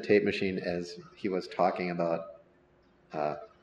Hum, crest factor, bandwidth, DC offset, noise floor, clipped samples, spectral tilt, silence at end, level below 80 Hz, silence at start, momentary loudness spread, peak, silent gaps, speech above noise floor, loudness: none; 20 dB; 9.4 kHz; under 0.1%; -64 dBFS; under 0.1%; -6.5 dB/octave; 0.15 s; -68 dBFS; 0 s; 12 LU; -12 dBFS; none; 33 dB; -32 LUFS